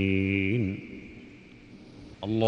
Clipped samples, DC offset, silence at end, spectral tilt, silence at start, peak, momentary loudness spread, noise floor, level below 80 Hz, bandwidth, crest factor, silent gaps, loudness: under 0.1%; under 0.1%; 0 s; -8.5 dB/octave; 0 s; -12 dBFS; 24 LU; -50 dBFS; -58 dBFS; 6.8 kHz; 18 dB; none; -29 LUFS